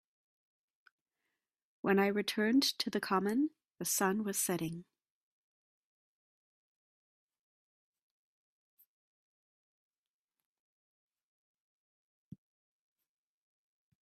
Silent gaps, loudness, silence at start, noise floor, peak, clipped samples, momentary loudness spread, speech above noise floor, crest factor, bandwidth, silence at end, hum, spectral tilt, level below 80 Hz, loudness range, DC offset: none; -33 LUFS; 1.85 s; under -90 dBFS; -16 dBFS; under 0.1%; 10 LU; over 57 dB; 24 dB; 15.5 kHz; 9.2 s; none; -3.5 dB/octave; -80 dBFS; 9 LU; under 0.1%